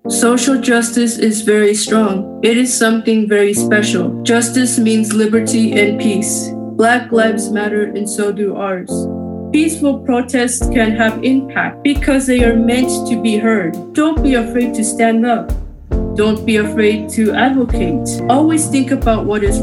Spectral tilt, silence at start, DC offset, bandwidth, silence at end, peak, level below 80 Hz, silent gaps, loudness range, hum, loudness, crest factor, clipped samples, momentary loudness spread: -4.5 dB/octave; 0.05 s; under 0.1%; 13.5 kHz; 0 s; 0 dBFS; -28 dBFS; none; 3 LU; none; -14 LUFS; 14 dB; under 0.1%; 6 LU